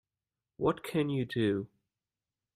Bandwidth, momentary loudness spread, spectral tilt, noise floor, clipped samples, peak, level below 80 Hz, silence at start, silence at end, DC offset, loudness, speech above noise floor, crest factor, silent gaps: 14 kHz; 5 LU; -7 dB/octave; under -90 dBFS; under 0.1%; -16 dBFS; -68 dBFS; 0.6 s; 0.9 s; under 0.1%; -32 LUFS; over 59 dB; 20 dB; none